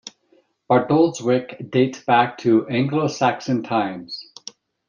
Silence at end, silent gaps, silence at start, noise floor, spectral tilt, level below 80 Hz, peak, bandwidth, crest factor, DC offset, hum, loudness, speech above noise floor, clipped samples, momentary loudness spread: 0.65 s; none; 0.05 s; -60 dBFS; -6 dB/octave; -64 dBFS; -4 dBFS; 7.4 kHz; 18 dB; under 0.1%; none; -20 LUFS; 41 dB; under 0.1%; 16 LU